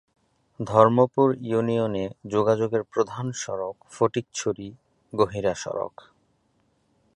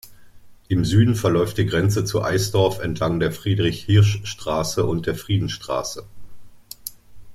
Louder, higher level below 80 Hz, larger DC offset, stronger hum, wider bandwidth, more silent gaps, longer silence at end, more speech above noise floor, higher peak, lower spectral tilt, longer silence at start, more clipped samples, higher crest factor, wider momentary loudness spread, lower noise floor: second, -24 LUFS vs -21 LUFS; second, -60 dBFS vs -44 dBFS; neither; neither; second, 10.5 kHz vs 15 kHz; neither; first, 1.3 s vs 0 s; first, 44 dB vs 24 dB; about the same, -2 dBFS vs -4 dBFS; about the same, -6 dB/octave vs -6 dB/octave; first, 0.6 s vs 0.05 s; neither; about the same, 22 dB vs 18 dB; about the same, 15 LU vs 14 LU; first, -68 dBFS vs -43 dBFS